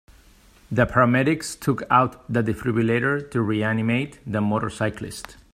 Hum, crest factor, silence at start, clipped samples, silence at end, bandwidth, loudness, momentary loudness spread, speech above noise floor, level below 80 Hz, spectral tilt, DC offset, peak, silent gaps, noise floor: none; 20 dB; 0.7 s; under 0.1%; 0.2 s; 15.5 kHz; -22 LUFS; 9 LU; 30 dB; -50 dBFS; -6.5 dB/octave; under 0.1%; -2 dBFS; none; -53 dBFS